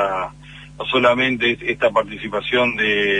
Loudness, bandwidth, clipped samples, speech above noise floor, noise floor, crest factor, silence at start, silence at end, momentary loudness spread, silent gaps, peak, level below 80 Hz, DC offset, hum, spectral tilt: -18 LUFS; 10 kHz; under 0.1%; 21 dB; -40 dBFS; 18 dB; 0 s; 0 s; 10 LU; none; 0 dBFS; -48 dBFS; under 0.1%; 50 Hz at -45 dBFS; -5 dB/octave